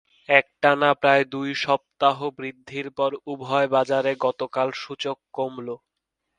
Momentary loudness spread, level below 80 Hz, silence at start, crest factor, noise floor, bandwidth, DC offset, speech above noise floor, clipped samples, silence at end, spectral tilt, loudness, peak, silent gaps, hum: 14 LU; -70 dBFS; 0.3 s; 22 dB; -80 dBFS; 9.8 kHz; under 0.1%; 57 dB; under 0.1%; 0.65 s; -5 dB/octave; -23 LUFS; 0 dBFS; none; none